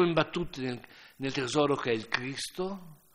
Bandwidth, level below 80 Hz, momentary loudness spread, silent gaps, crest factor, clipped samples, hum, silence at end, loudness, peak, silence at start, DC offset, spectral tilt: 16 kHz; -58 dBFS; 12 LU; none; 24 dB; under 0.1%; none; 0.2 s; -31 LUFS; -8 dBFS; 0 s; under 0.1%; -5 dB/octave